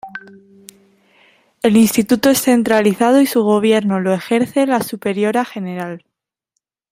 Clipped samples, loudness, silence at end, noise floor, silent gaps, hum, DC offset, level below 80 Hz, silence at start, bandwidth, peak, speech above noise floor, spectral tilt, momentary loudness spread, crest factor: under 0.1%; -15 LUFS; 0.95 s; -75 dBFS; none; none; under 0.1%; -58 dBFS; 0.05 s; 16 kHz; -2 dBFS; 61 dB; -5 dB/octave; 13 LU; 14 dB